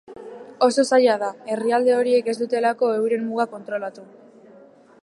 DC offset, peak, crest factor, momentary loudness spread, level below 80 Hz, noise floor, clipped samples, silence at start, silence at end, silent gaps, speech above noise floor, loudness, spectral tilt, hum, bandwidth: under 0.1%; -4 dBFS; 18 dB; 14 LU; -78 dBFS; -49 dBFS; under 0.1%; 0.1 s; 1 s; none; 29 dB; -21 LUFS; -4 dB/octave; none; 11.5 kHz